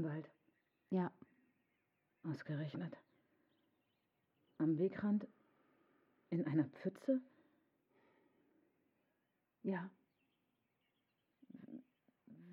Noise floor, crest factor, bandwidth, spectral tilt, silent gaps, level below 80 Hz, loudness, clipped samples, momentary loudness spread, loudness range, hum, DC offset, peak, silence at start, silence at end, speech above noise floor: -85 dBFS; 20 dB; 6.6 kHz; -8.5 dB/octave; none; under -90 dBFS; -42 LUFS; under 0.1%; 20 LU; 11 LU; none; under 0.1%; -24 dBFS; 0 s; 0 s; 45 dB